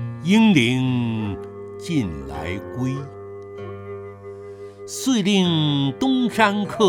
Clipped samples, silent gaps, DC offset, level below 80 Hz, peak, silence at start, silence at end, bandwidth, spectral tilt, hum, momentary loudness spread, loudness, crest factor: under 0.1%; none; under 0.1%; -50 dBFS; -2 dBFS; 0 s; 0 s; 16.5 kHz; -5.5 dB/octave; none; 20 LU; -20 LUFS; 20 dB